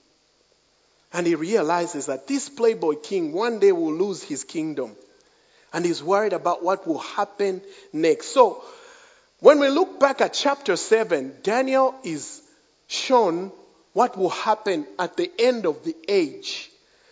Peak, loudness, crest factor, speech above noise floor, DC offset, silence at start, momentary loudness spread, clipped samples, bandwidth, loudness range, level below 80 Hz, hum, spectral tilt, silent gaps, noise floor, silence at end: 0 dBFS; -22 LUFS; 22 dB; 41 dB; under 0.1%; 1.15 s; 12 LU; under 0.1%; 8 kHz; 5 LU; -78 dBFS; none; -4 dB/octave; none; -63 dBFS; 0.45 s